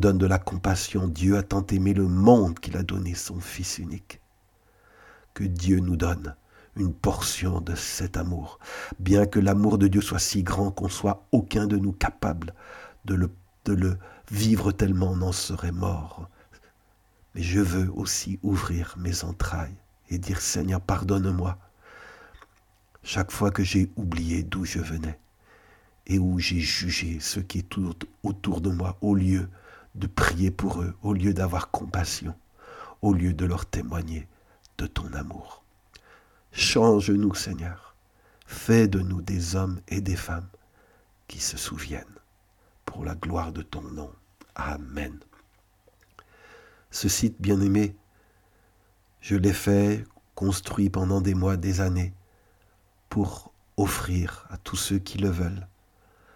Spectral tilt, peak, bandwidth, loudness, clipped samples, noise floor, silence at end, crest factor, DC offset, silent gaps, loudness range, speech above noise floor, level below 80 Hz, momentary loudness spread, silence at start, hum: -5.5 dB/octave; -4 dBFS; 17.5 kHz; -26 LUFS; under 0.1%; -62 dBFS; 0.7 s; 24 dB; under 0.1%; none; 9 LU; 37 dB; -42 dBFS; 16 LU; 0 s; none